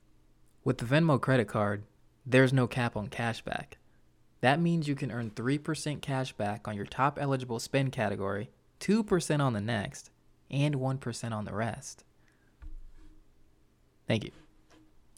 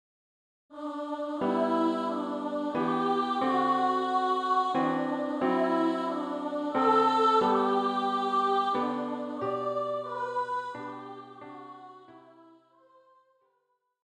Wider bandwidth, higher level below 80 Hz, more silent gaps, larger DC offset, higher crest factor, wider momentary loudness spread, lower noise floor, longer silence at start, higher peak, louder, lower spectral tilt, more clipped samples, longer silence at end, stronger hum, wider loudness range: first, 15 kHz vs 10.5 kHz; first, -56 dBFS vs -76 dBFS; neither; neither; first, 22 dB vs 16 dB; second, 13 LU vs 16 LU; second, -65 dBFS vs -76 dBFS; about the same, 0.65 s vs 0.7 s; about the same, -10 dBFS vs -12 dBFS; second, -31 LUFS vs -28 LUFS; about the same, -6 dB/octave vs -6 dB/octave; neither; second, 0.85 s vs 1.85 s; neither; about the same, 10 LU vs 11 LU